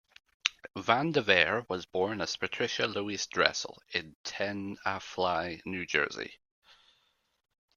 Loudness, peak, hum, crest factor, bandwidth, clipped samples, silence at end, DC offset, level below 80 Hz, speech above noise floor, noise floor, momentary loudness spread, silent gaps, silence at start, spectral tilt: -31 LUFS; -4 dBFS; none; 30 dB; 10 kHz; under 0.1%; 1.4 s; under 0.1%; -68 dBFS; 41 dB; -72 dBFS; 11 LU; 4.15-4.24 s; 0.45 s; -3 dB/octave